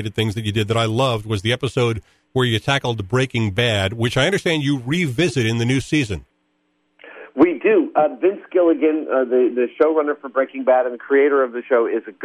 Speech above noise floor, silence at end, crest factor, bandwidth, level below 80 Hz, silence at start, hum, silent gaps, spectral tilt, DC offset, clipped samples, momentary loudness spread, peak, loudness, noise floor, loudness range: 48 dB; 0 s; 16 dB; 13.5 kHz; -50 dBFS; 0 s; none; none; -6 dB/octave; under 0.1%; under 0.1%; 6 LU; -2 dBFS; -19 LUFS; -67 dBFS; 3 LU